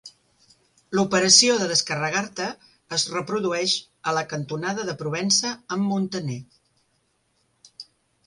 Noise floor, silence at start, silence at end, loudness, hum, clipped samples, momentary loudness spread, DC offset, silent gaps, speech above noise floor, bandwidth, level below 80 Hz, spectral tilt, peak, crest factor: -69 dBFS; 0.05 s; 0.45 s; -22 LUFS; none; under 0.1%; 17 LU; under 0.1%; none; 46 dB; 11.5 kHz; -66 dBFS; -2.5 dB/octave; -2 dBFS; 24 dB